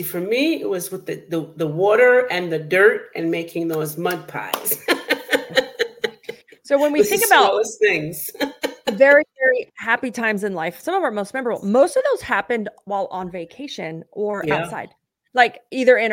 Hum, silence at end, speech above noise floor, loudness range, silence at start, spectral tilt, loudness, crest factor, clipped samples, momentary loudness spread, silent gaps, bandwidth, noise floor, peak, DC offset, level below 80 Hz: none; 0 s; 19 dB; 5 LU; 0 s; -3.5 dB/octave; -19 LUFS; 18 dB; under 0.1%; 14 LU; none; 17 kHz; -38 dBFS; -2 dBFS; under 0.1%; -64 dBFS